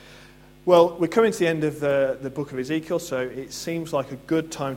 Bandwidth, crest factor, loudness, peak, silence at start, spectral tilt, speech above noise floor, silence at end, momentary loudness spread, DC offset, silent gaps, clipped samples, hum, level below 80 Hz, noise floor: 16.5 kHz; 20 dB; -24 LUFS; -4 dBFS; 0.05 s; -5.5 dB/octave; 26 dB; 0 s; 13 LU; under 0.1%; none; under 0.1%; none; -58 dBFS; -49 dBFS